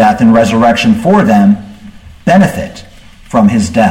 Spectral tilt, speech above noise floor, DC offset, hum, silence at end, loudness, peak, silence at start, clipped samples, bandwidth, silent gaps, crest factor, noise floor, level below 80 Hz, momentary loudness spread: -6.5 dB/octave; 25 dB; under 0.1%; none; 0 s; -9 LUFS; 0 dBFS; 0 s; under 0.1%; 13.5 kHz; none; 10 dB; -32 dBFS; -36 dBFS; 9 LU